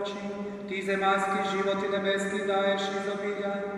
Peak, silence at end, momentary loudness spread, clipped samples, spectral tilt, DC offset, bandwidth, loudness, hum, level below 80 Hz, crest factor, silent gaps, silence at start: -14 dBFS; 0 s; 9 LU; under 0.1%; -4.5 dB/octave; under 0.1%; 12 kHz; -29 LUFS; none; -68 dBFS; 14 dB; none; 0 s